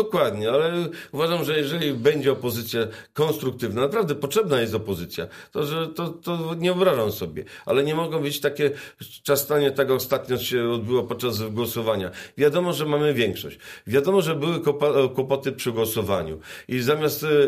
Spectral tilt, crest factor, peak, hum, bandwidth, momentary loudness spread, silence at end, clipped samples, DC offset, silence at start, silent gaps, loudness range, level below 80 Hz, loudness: -5 dB/octave; 18 dB; -6 dBFS; none; 15.5 kHz; 9 LU; 0 s; under 0.1%; under 0.1%; 0 s; none; 2 LU; -58 dBFS; -24 LUFS